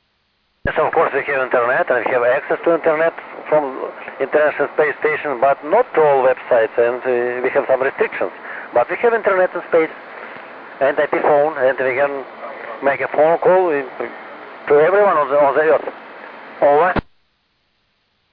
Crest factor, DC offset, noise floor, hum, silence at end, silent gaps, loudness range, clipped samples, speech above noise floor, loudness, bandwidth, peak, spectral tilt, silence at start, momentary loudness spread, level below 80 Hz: 12 dB; under 0.1%; -64 dBFS; none; 1.3 s; none; 2 LU; under 0.1%; 49 dB; -17 LUFS; 5 kHz; -4 dBFS; -9 dB/octave; 0.65 s; 16 LU; -48 dBFS